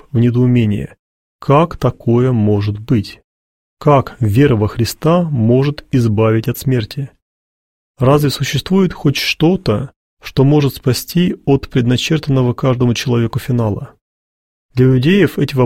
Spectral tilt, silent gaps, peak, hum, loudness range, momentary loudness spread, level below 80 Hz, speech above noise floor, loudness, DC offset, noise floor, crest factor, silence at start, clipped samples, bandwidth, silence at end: -7 dB/octave; 0.99-1.39 s, 3.24-3.77 s, 7.22-7.94 s, 9.96-10.17 s, 14.01-14.69 s; 0 dBFS; none; 2 LU; 8 LU; -40 dBFS; over 77 dB; -14 LUFS; 0.3%; under -90 dBFS; 14 dB; 0.15 s; under 0.1%; 16.5 kHz; 0 s